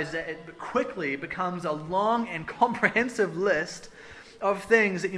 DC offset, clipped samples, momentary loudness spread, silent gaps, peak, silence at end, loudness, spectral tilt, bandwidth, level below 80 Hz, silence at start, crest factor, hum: under 0.1%; under 0.1%; 15 LU; none; -6 dBFS; 0 s; -27 LUFS; -5 dB/octave; 11 kHz; -60 dBFS; 0 s; 22 dB; none